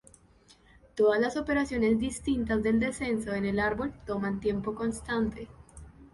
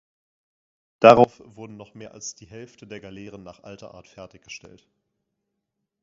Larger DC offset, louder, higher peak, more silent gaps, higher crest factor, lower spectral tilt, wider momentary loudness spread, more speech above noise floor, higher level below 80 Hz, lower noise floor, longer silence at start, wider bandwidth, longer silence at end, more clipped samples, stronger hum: neither; second, -29 LUFS vs -16 LUFS; second, -14 dBFS vs 0 dBFS; neither; second, 16 dB vs 24 dB; first, -6 dB/octave vs -4.5 dB/octave; second, 8 LU vs 28 LU; second, 31 dB vs 58 dB; first, -48 dBFS vs -62 dBFS; second, -60 dBFS vs -81 dBFS; about the same, 0.95 s vs 1.05 s; first, 11.5 kHz vs 7.6 kHz; second, 0.05 s vs 3.05 s; neither; neither